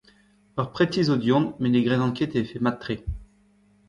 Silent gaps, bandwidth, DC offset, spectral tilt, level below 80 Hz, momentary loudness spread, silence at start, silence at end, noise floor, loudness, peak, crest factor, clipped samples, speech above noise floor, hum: none; 9 kHz; under 0.1%; -7.5 dB/octave; -46 dBFS; 11 LU; 0.55 s; 0.65 s; -60 dBFS; -24 LUFS; -8 dBFS; 16 dB; under 0.1%; 37 dB; 50 Hz at -60 dBFS